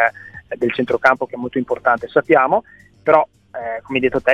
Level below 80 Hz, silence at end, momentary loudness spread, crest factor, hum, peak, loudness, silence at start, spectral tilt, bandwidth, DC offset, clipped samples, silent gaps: -54 dBFS; 0 s; 13 LU; 18 dB; none; 0 dBFS; -18 LUFS; 0 s; -6.5 dB/octave; 9.8 kHz; under 0.1%; under 0.1%; none